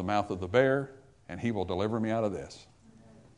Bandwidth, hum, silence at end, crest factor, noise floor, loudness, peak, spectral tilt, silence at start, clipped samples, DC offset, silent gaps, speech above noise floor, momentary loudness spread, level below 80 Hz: 10.5 kHz; none; 0.75 s; 22 dB; -56 dBFS; -30 LUFS; -10 dBFS; -7 dB/octave; 0 s; under 0.1%; under 0.1%; none; 26 dB; 19 LU; -64 dBFS